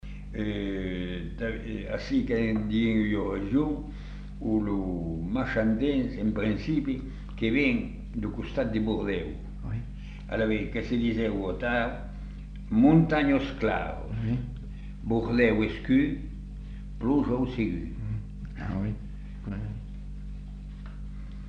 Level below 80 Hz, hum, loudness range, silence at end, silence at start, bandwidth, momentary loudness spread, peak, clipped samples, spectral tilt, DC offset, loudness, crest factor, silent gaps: -40 dBFS; 50 Hz at -40 dBFS; 5 LU; 0 s; 0.05 s; 7.4 kHz; 17 LU; -10 dBFS; under 0.1%; -8.5 dB/octave; under 0.1%; -29 LUFS; 20 dB; none